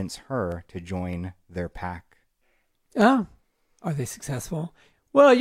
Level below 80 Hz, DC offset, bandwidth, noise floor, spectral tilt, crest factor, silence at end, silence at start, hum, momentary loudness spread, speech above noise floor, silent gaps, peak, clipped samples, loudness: -54 dBFS; under 0.1%; 15.5 kHz; -69 dBFS; -6 dB/octave; 20 dB; 0 s; 0 s; none; 16 LU; 41 dB; none; -6 dBFS; under 0.1%; -26 LUFS